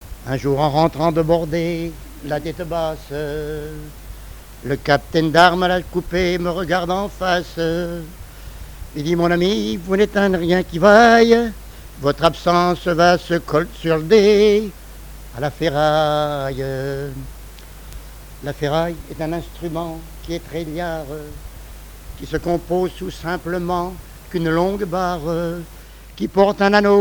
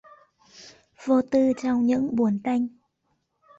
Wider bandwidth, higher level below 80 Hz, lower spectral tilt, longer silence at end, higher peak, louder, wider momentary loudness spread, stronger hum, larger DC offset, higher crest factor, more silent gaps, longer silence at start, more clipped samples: first, over 20 kHz vs 7.8 kHz; first, -38 dBFS vs -64 dBFS; about the same, -6 dB/octave vs -7 dB/octave; second, 0 s vs 0.9 s; first, 0 dBFS vs -10 dBFS; first, -18 LUFS vs -24 LUFS; first, 24 LU vs 6 LU; neither; first, 0.1% vs under 0.1%; about the same, 18 dB vs 14 dB; neither; second, 0 s vs 0.6 s; neither